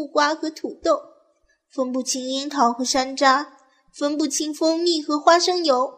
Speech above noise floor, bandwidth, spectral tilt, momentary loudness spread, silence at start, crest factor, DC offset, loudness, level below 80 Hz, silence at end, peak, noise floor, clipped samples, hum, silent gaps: 43 dB; 15 kHz; -1 dB/octave; 10 LU; 0 s; 20 dB; under 0.1%; -21 LUFS; -62 dBFS; 0.05 s; -2 dBFS; -64 dBFS; under 0.1%; none; none